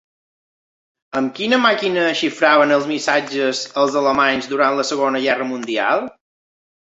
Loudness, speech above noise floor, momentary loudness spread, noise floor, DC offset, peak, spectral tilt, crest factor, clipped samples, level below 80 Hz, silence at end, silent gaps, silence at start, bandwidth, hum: -17 LUFS; over 73 dB; 7 LU; under -90 dBFS; under 0.1%; 0 dBFS; -3.5 dB/octave; 18 dB; under 0.1%; -62 dBFS; 0.75 s; none; 1.15 s; 8 kHz; none